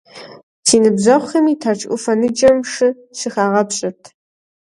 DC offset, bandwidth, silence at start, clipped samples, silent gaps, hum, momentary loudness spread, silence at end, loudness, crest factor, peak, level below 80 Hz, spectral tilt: under 0.1%; 11.5 kHz; 0.15 s; under 0.1%; 0.43-0.63 s; none; 9 LU; 0.85 s; -15 LUFS; 16 dB; 0 dBFS; -56 dBFS; -4 dB/octave